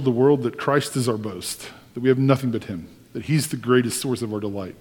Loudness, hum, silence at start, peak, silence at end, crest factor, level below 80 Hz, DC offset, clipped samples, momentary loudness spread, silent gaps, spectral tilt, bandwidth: -22 LUFS; none; 0 s; -2 dBFS; 0.05 s; 20 dB; -58 dBFS; under 0.1%; under 0.1%; 15 LU; none; -5.5 dB/octave; 19 kHz